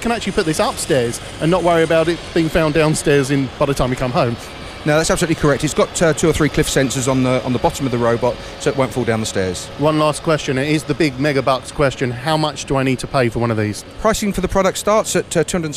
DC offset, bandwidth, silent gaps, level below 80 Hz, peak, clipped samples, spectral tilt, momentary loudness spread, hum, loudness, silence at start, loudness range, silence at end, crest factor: under 0.1%; 15.5 kHz; none; -36 dBFS; -2 dBFS; under 0.1%; -5 dB/octave; 5 LU; none; -17 LUFS; 0 s; 2 LU; 0 s; 16 dB